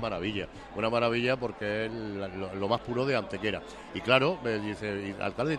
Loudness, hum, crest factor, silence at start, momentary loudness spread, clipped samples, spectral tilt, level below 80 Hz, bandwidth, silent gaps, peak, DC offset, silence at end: -30 LUFS; none; 22 dB; 0 s; 11 LU; under 0.1%; -6 dB/octave; -56 dBFS; 12 kHz; none; -10 dBFS; under 0.1%; 0 s